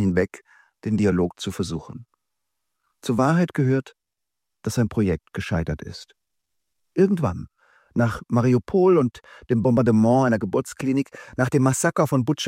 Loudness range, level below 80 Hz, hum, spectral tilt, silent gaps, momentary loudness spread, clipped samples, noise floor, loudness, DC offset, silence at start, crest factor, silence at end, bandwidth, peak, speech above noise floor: 6 LU; -48 dBFS; none; -6.5 dB/octave; none; 13 LU; under 0.1%; -85 dBFS; -22 LUFS; under 0.1%; 0 s; 16 dB; 0 s; 16 kHz; -6 dBFS; 64 dB